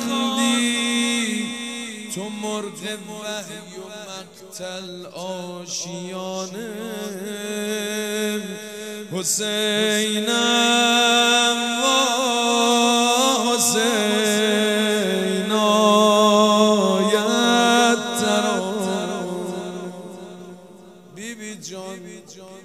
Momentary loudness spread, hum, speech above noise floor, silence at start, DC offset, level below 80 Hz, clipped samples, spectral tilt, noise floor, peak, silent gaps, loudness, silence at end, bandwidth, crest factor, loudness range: 19 LU; none; 23 dB; 0 s; under 0.1%; -72 dBFS; under 0.1%; -2.5 dB/octave; -44 dBFS; -4 dBFS; none; -19 LUFS; 0.05 s; 16 kHz; 18 dB; 14 LU